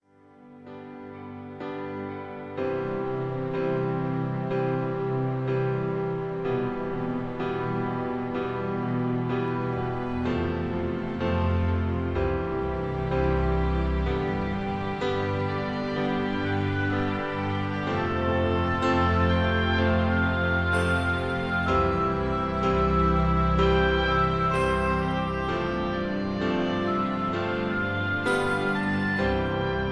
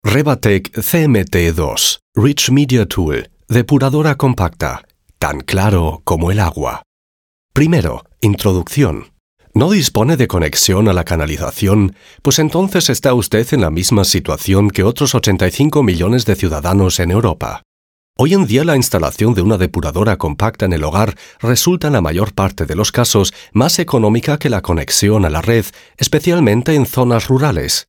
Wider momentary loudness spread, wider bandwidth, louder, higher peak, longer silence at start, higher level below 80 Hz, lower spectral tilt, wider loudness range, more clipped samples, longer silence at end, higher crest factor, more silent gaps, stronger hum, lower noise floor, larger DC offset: about the same, 7 LU vs 6 LU; second, 10.5 kHz vs 18 kHz; second, -26 LUFS vs -14 LUFS; second, -10 dBFS vs 0 dBFS; first, 0.4 s vs 0.05 s; second, -38 dBFS vs -30 dBFS; first, -7.5 dB/octave vs -5 dB/octave; about the same, 5 LU vs 3 LU; neither; about the same, 0 s vs 0.05 s; about the same, 16 dB vs 14 dB; second, none vs 2.02-2.13 s, 6.86-7.49 s, 9.20-9.37 s, 17.65-18.14 s; neither; second, -53 dBFS vs under -90 dBFS; neither